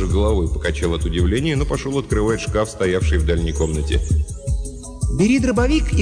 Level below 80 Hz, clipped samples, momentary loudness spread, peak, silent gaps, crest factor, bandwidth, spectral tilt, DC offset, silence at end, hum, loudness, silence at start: -22 dBFS; under 0.1%; 8 LU; -8 dBFS; none; 10 dB; 10 kHz; -6 dB/octave; under 0.1%; 0 s; none; -20 LUFS; 0 s